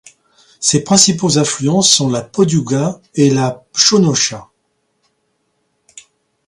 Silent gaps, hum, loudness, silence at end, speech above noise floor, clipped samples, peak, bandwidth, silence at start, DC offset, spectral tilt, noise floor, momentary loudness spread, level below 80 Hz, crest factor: none; none; -13 LUFS; 2.05 s; 52 dB; under 0.1%; 0 dBFS; 16 kHz; 0.6 s; under 0.1%; -3.5 dB/octave; -66 dBFS; 8 LU; -54 dBFS; 16 dB